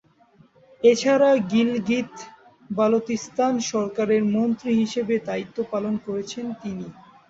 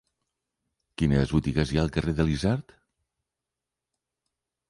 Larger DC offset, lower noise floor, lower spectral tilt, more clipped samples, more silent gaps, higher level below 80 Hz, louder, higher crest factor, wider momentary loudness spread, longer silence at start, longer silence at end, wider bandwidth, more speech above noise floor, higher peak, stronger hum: neither; second, -56 dBFS vs -87 dBFS; second, -5 dB/octave vs -7 dB/octave; neither; neither; second, -64 dBFS vs -40 dBFS; first, -23 LUFS vs -26 LUFS; about the same, 18 dB vs 20 dB; first, 14 LU vs 5 LU; second, 0.8 s vs 1 s; second, 0.35 s vs 2.1 s; second, 7.8 kHz vs 11.5 kHz; second, 34 dB vs 63 dB; first, -4 dBFS vs -8 dBFS; neither